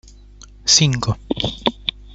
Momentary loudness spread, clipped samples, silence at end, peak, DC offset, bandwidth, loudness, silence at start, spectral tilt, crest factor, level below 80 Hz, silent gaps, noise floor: 11 LU; under 0.1%; 0 s; 0 dBFS; under 0.1%; 8 kHz; -18 LUFS; 0.65 s; -3 dB/octave; 20 dB; -40 dBFS; none; -42 dBFS